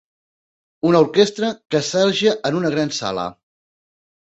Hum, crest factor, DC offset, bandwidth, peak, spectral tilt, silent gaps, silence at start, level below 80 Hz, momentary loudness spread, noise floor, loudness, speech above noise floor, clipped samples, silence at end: none; 18 dB; under 0.1%; 8.2 kHz; -2 dBFS; -4.5 dB/octave; none; 0.85 s; -60 dBFS; 9 LU; under -90 dBFS; -18 LUFS; over 72 dB; under 0.1%; 0.9 s